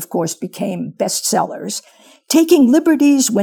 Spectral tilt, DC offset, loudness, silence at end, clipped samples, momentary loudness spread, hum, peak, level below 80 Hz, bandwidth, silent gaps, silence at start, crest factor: -4 dB/octave; under 0.1%; -15 LUFS; 0 s; under 0.1%; 13 LU; none; 0 dBFS; -66 dBFS; over 20 kHz; none; 0 s; 16 dB